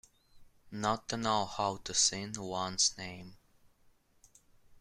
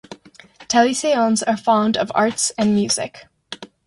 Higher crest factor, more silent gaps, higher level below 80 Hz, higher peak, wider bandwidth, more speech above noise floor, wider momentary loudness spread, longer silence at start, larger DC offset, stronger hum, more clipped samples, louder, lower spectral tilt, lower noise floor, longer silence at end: first, 22 dB vs 16 dB; neither; about the same, -64 dBFS vs -60 dBFS; second, -14 dBFS vs -4 dBFS; first, 14.5 kHz vs 11.5 kHz; first, 33 dB vs 28 dB; about the same, 16 LU vs 15 LU; first, 0.35 s vs 0.1 s; neither; neither; neither; second, -32 LUFS vs -18 LUFS; second, -2 dB/octave vs -3.5 dB/octave; first, -67 dBFS vs -46 dBFS; second, 0.05 s vs 0.2 s